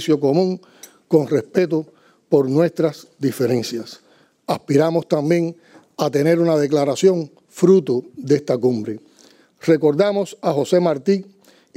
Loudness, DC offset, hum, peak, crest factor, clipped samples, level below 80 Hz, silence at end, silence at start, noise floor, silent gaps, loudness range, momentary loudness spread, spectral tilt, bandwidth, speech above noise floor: -19 LUFS; under 0.1%; none; -2 dBFS; 16 dB; under 0.1%; -72 dBFS; 0.55 s; 0 s; -52 dBFS; none; 3 LU; 11 LU; -6.5 dB/octave; 16 kHz; 34 dB